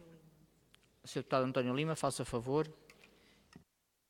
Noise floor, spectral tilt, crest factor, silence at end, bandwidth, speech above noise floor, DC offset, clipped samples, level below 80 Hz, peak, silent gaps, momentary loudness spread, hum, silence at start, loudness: -74 dBFS; -5.5 dB/octave; 20 dB; 0.5 s; 16.5 kHz; 38 dB; under 0.1%; under 0.1%; -68 dBFS; -18 dBFS; none; 10 LU; none; 0 s; -37 LUFS